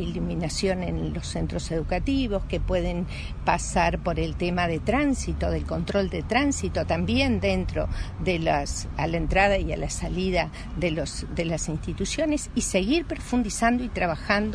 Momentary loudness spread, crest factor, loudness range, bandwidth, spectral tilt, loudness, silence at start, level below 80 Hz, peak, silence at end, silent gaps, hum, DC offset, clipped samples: 7 LU; 20 dB; 2 LU; 11 kHz; -5 dB/octave; -26 LUFS; 0 s; -34 dBFS; -6 dBFS; 0 s; none; none; under 0.1%; under 0.1%